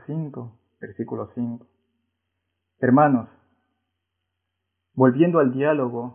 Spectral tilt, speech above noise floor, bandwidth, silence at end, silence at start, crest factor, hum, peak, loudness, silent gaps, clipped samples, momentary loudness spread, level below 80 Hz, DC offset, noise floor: -12.5 dB/octave; 59 dB; 3.5 kHz; 0 s; 0.1 s; 22 dB; none; -2 dBFS; -21 LUFS; none; under 0.1%; 22 LU; -68 dBFS; under 0.1%; -80 dBFS